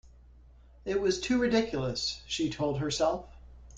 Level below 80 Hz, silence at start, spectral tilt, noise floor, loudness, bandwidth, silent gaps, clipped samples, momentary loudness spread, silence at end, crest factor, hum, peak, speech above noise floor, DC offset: -52 dBFS; 0.05 s; -4.5 dB/octave; -55 dBFS; -30 LUFS; 9.4 kHz; none; under 0.1%; 7 LU; 0 s; 16 dB; none; -14 dBFS; 25 dB; under 0.1%